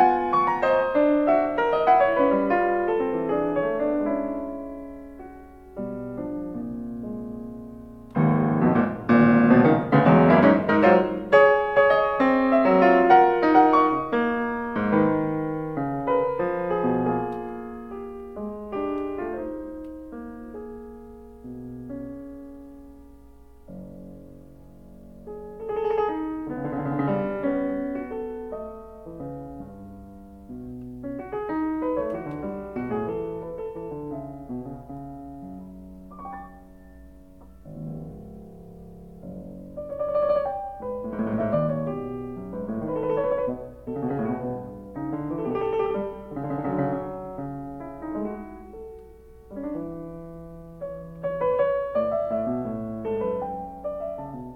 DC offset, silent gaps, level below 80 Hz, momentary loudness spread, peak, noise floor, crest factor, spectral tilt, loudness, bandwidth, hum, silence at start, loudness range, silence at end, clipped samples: under 0.1%; none; -50 dBFS; 23 LU; -4 dBFS; -50 dBFS; 22 dB; -9 dB/octave; -24 LUFS; 6 kHz; none; 0 s; 22 LU; 0 s; under 0.1%